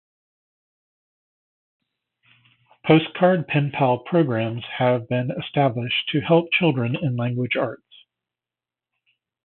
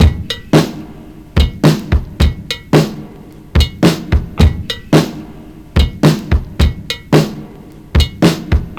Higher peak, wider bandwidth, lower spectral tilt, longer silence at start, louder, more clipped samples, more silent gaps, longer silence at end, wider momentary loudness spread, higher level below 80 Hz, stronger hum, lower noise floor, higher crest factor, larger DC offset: about the same, -2 dBFS vs 0 dBFS; second, 4.3 kHz vs 17.5 kHz; first, -11.5 dB/octave vs -6 dB/octave; first, 2.85 s vs 0 s; second, -21 LUFS vs -14 LUFS; neither; neither; first, 1.7 s vs 0 s; second, 7 LU vs 18 LU; second, -64 dBFS vs -18 dBFS; neither; first, -90 dBFS vs -34 dBFS; first, 22 dB vs 14 dB; neither